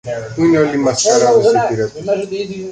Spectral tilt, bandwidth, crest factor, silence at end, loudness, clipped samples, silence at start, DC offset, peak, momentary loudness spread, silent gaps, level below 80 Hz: -4.5 dB/octave; 9.4 kHz; 12 dB; 0 s; -14 LUFS; under 0.1%; 0.05 s; under 0.1%; -2 dBFS; 11 LU; none; -50 dBFS